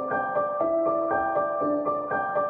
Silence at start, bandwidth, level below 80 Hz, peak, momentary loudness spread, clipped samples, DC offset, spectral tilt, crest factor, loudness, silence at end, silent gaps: 0 s; 3.7 kHz; -62 dBFS; -12 dBFS; 2 LU; under 0.1%; under 0.1%; -10 dB/octave; 12 dB; -26 LUFS; 0 s; none